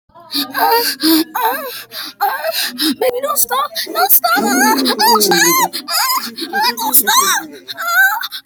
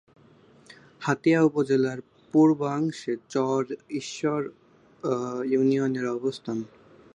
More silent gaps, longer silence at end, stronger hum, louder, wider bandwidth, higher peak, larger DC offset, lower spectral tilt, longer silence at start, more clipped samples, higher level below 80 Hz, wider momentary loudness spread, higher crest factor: neither; second, 0.05 s vs 0.5 s; neither; first, -13 LUFS vs -26 LUFS; first, over 20 kHz vs 10 kHz; first, 0 dBFS vs -8 dBFS; neither; second, -1 dB/octave vs -6.5 dB/octave; second, 0.15 s vs 0.7 s; neither; first, -64 dBFS vs -72 dBFS; about the same, 10 LU vs 12 LU; about the same, 14 dB vs 18 dB